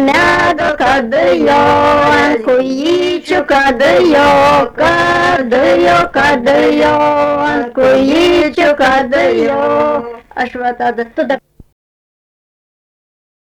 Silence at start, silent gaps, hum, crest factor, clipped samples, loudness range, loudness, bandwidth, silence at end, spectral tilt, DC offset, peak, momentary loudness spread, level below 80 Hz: 0 s; none; none; 6 dB; under 0.1%; 7 LU; -10 LUFS; 14.5 kHz; 2.05 s; -5 dB/octave; under 0.1%; -4 dBFS; 8 LU; -38 dBFS